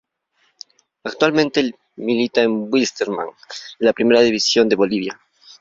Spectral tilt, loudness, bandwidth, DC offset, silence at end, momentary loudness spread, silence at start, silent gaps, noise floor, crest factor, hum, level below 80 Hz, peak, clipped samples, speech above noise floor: -4 dB/octave; -18 LUFS; 7.8 kHz; under 0.1%; 0.5 s; 16 LU; 1.05 s; none; -65 dBFS; 18 dB; none; -60 dBFS; -2 dBFS; under 0.1%; 47 dB